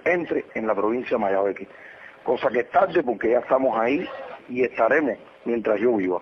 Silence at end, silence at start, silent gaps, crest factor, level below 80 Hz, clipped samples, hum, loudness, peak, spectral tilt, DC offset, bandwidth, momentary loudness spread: 0 s; 0.05 s; none; 16 dB; -62 dBFS; under 0.1%; none; -23 LUFS; -8 dBFS; -7.5 dB/octave; under 0.1%; 6.6 kHz; 13 LU